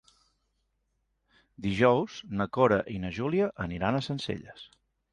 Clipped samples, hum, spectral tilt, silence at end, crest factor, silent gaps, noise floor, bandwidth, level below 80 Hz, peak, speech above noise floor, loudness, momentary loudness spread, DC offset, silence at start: under 0.1%; none; -7 dB/octave; 0.5 s; 22 dB; none; -77 dBFS; 10.5 kHz; -54 dBFS; -8 dBFS; 49 dB; -29 LUFS; 12 LU; under 0.1%; 1.6 s